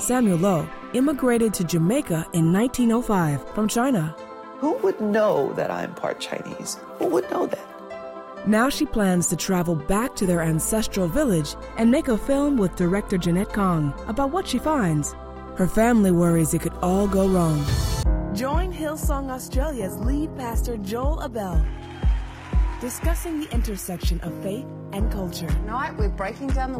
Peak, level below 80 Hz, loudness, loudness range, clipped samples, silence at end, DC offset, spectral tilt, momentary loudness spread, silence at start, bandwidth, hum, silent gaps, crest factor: -6 dBFS; -30 dBFS; -23 LUFS; 6 LU; under 0.1%; 0 s; under 0.1%; -6 dB/octave; 9 LU; 0 s; 16.5 kHz; none; none; 16 dB